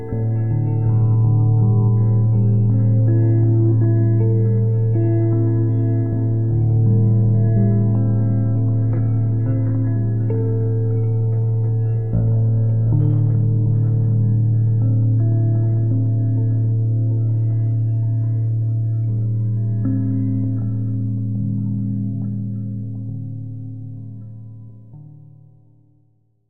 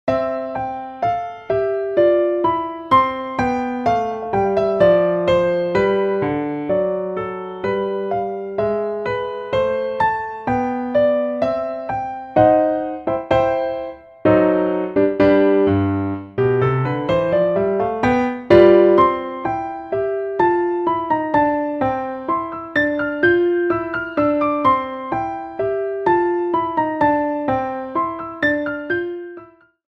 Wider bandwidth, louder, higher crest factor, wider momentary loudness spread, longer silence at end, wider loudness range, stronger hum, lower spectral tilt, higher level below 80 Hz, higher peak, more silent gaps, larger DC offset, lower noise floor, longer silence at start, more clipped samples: second, 1.8 kHz vs 7.4 kHz; about the same, -18 LUFS vs -19 LUFS; second, 10 dB vs 18 dB; about the same, 8 LU vs 10 LU; second, 0 s vs 0.55 s; first, 9 LU vs 5 LU; neither; first, -14.5 dB/octave vs -8 dB/octave; first, -42 dBFS vs -48 dBFS; second, -6 dBFS vs 0 dBFS; neither; first, 2% vs under 0.1%; first, -60 dBFS vs -43 dBFS; about the same, 0 s vs 0.05 s; neither